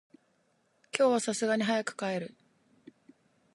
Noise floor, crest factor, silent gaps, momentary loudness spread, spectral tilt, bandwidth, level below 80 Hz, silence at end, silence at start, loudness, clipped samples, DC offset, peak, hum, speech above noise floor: -72 dBFS; 22 dB; none; 11 LU; -4 dB/octave; 11.5 kHz; -84 dBFS; 1.3 s; 0.95 s; -30 LUFS; under 0.1%; under 0.1%; -10 dBFS; none; 43 dB